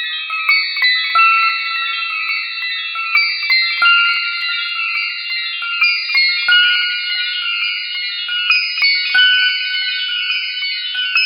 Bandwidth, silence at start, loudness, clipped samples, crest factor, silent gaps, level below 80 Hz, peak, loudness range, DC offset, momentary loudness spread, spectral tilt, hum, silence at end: 18.5 kHz; 0 s; -14 LUFS; under 0.1%; 16 dB; none; -80 dBFS; 0 dBFS; 1 LU; under 0.1%; 8 LU; 3.5 dB/octave; none; 0 s